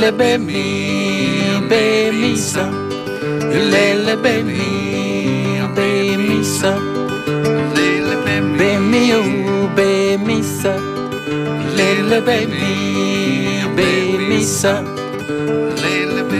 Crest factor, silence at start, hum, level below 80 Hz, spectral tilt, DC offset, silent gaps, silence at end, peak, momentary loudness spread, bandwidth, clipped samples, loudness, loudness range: 14 dB; 0 s; none; -50 dBFS; -4.5 dB/octave; under 0.1%; none; 0 s; -2 dBFS; 7 LU; 15.5 kHz; under 0.1%; -16 LUFS; 2 LU